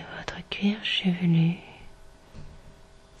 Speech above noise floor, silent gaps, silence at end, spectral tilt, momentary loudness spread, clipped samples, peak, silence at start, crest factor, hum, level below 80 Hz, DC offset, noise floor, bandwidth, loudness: 27 dB; none; 0.5 s; -6.5 dB/octave; 25 LU; under 0.1%; -10 dBFS; 0 s; 20 dB; none; -52 dBFS; under 0.1%; -51 dBFS; 8.4 kHz; -26 LUFS